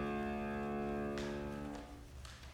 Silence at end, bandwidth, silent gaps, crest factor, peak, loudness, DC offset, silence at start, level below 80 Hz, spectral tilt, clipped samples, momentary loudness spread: 0 s; 16 kHz; none; 14 dB; -28 dBFS; -42 LUFS; under 0.1%; 0 s; -54 dBFS; -6.5 dB/octave; under 0.1%; 13 LU